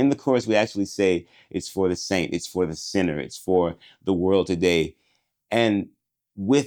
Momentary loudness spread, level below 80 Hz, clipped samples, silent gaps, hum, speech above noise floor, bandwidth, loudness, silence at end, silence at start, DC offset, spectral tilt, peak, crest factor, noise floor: 10 LU; -58 dBFS; under 0.1%; none; none; 47 dB; 19.5 kHz; -24 LUFS; 0 s; 0 s; under 0.1%; -5 dB/octave; -4 dBFS; 18 dB; -70 dBFS